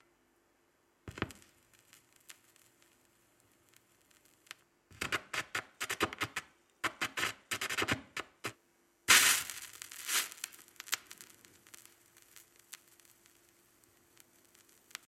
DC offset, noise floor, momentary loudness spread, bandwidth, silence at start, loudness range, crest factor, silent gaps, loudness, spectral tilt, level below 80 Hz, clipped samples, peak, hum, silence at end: under 0.1%; -73 dBFS; 26 LU; 16.5 kHz; 1.05 s; 20 LU; 30 dB; none; -33 LUFS; -0.5 dB/octave; -70 dBFS; under 0.1%; -10 dBFS; none; 2.35 s